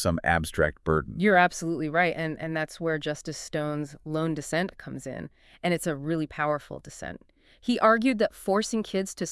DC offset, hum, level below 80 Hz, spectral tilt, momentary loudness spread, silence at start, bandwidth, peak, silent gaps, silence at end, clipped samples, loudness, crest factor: under 0.1%; none; -52 dBFS; -5 dB/octave; 17 LU; 0 s; 12 kHz; -8 dBFS; none; 0 s; under 0.1%; -27 LUFS; 20 dB